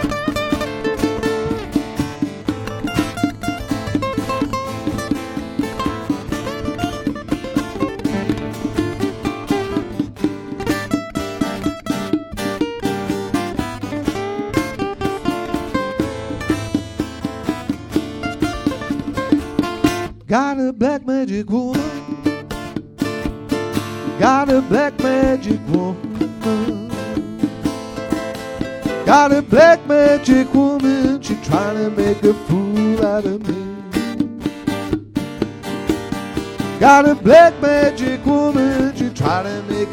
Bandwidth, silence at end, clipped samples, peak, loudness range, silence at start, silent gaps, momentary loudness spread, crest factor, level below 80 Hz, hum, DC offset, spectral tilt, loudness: 17 kHz; 0 s; under 0.1%; 0 dBFS; 9 LU; 0 s; none; 12 LU; 18 dB; -40 dBFS; none; under 0.1%; -6 dB/octave; -19 LUFS